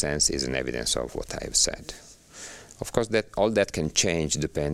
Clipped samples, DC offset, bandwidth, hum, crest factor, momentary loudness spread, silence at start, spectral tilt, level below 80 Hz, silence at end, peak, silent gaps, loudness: under 0.1%; under 0.1%; 16 kHz; none; 22 dB; 18 LU; 0 s; -3 dB/octave; -44 dBFS; 0 s; -4 dBFS; none; -25 LUFS